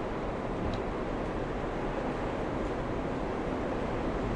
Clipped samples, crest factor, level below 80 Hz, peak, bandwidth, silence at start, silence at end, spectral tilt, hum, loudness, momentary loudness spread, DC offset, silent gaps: under 0.1%; 12 dB; -42 dBFS; -20 dBFS; 11 kHz; 0 s; 0 s; -7 dB/octave; none; -34 LUFS; 1 LU; under 0.1%; none